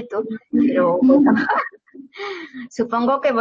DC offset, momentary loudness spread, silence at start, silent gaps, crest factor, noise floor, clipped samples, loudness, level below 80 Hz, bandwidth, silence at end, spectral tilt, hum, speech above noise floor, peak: under 0.1%; 17 LU; 0 s; none; 16 dB; -42 dBFS; under 0.1%; -18 LUFS; -60 dBFS; 7.6 kHz; 0 s; -7 dB/octave; none; 24 dB; -4 dBFS